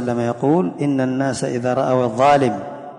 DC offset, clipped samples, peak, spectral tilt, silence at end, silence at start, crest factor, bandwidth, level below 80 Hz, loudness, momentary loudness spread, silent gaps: under 0.1%; under 0.1%; -6 dBFS; -6.5 dB/octave; 0 s; 0 s; 12 dB; 11 kHz; -56 dBFS; -18 LUFS; 7 LU; none